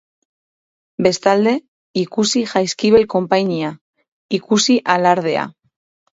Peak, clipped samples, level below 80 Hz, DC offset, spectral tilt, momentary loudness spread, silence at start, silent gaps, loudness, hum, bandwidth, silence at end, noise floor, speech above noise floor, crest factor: 0 dBFS; under 0.1%; -56 dBFS; under 0.1%; -4 dB/octave; 10 LU; 1 s; 1.68-1.94 s, 3.81-3.93 s, 4.08-4.29 s; -17 LUFS; none; 8 kHz; 0.65 s; under -90 dBFS; over 74 dB; 18 dB